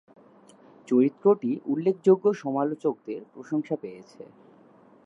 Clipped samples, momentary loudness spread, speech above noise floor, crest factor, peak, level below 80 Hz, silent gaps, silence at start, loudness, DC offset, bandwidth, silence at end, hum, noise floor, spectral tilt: under 0.1%; 16 LU; 30 dB; 18 dB; -8 dBFS; -84 dBFS; none; 0.9 s; -25 LUFS; under 0.1%; 8 kHz; 0.8 s; none; -55 dBFS; -8.5 dB/octave